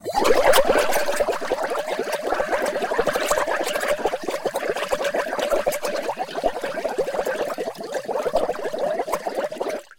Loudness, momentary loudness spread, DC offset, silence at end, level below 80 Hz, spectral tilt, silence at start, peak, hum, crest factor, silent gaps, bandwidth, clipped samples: -23 LUFS; 8 LU; under 0.1%; 0.15 s; -48 dBFS; -2.5 dB/octave; 0.05 s; -6 dBFS; none; 18 dB; none; 17 kHz; under 0.1%